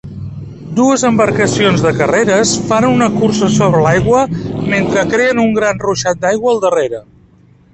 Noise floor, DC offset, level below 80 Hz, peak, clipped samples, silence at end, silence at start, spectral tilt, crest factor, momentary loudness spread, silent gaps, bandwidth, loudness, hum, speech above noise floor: -46 dBFS; under 0.1%; -40 dBFS; 0 dBFS; under 0.1%; 0.7 s; 0.05 s; -5 dB/octave; 12 dB; 8 LU; none; 8.8 kHz; -12 LUFS; none; 34 dB